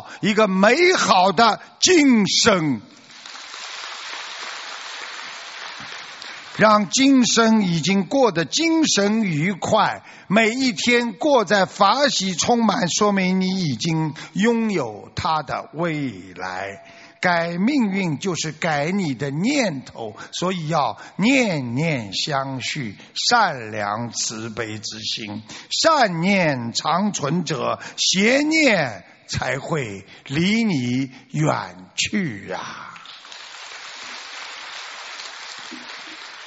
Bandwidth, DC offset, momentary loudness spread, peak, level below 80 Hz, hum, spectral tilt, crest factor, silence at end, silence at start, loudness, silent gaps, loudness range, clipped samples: 8 kHz; under 0.1%; 17 LU; -2 dBFS; -58 dBFS; none; -3.5 dB/octave; 20 dB; 0 s; 0 s; -20 LUFS; none; 9 LU; under 0.1%